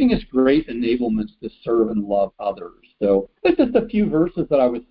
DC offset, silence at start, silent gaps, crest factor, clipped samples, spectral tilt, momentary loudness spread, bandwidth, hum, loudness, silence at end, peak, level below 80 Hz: under 0.1%; 0 s; none; 16 dB; under 0.1%; -12 dB/octave; 10 LU; 5.2 kHz; none; -20 LUFS; 0.1 s; -4 dBFS; -44 dBFS